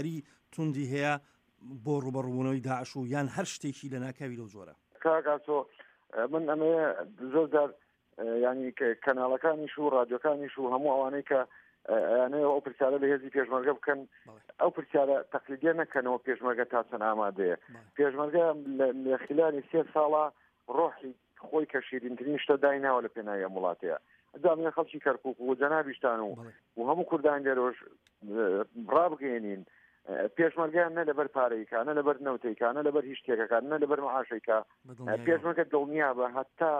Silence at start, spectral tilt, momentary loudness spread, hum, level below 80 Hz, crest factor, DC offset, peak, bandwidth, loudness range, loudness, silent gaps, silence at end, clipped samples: 0 s; -6.5 dB/octave; 10 LU; none; -82 dBFS; 18 dB; under 0.1%; -12 dBFS; 10 kHz; 4 LU; -31 LUFS; none; 0 s; under 0.1%